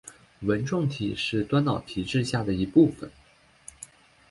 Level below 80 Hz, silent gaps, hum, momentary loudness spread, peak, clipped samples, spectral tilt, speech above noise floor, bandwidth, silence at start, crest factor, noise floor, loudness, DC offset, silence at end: -52 dBFS; none; none; 22 LU; -8 dBFS; under 0.1%; -6.5 dB/octave; 33 dB; 11.5 kHz; 0.05 s; 20 dB; -58 dBFS; -26 LUFS; under 0.1%; 0.45 s